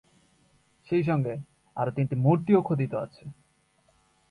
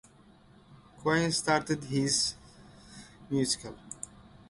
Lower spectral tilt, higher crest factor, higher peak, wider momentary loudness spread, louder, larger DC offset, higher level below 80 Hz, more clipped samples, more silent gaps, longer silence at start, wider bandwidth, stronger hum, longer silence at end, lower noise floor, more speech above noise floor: first, -10 dB/octave vs -3.5 dB/octave; about the same, 20 dB vs 22 dB; about the same, -10 dBFS vs -12 dBFS; second, 17 LU vs 23 LU; first, -26 LUFS vs -29 LUFS; neither; about the same, -64 dBFS vs -60 dBFS; neither; neither; first, 0.9 s vs 0.7 s; about the same, 10.5 kHz vs 11.5 kHz; neither; first, 1 s vs 0.25 s; first, -67 dBFS vs -58 dBFS; first, 41 dB vs 29 dB